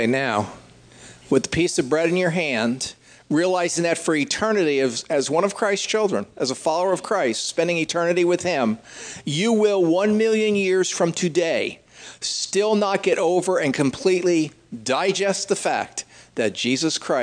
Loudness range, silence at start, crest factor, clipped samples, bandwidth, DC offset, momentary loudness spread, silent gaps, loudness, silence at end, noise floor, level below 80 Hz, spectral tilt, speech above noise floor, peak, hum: 2 LU; 0 s; 18 dB; under 0.1%; 10.5 kHz; under 0.1%; 7 LU; none; -21 LUFS; 0 s; -46 dBFS; -60 dBFS; -4 dB/octave; 25 dB; -4 dBFS; none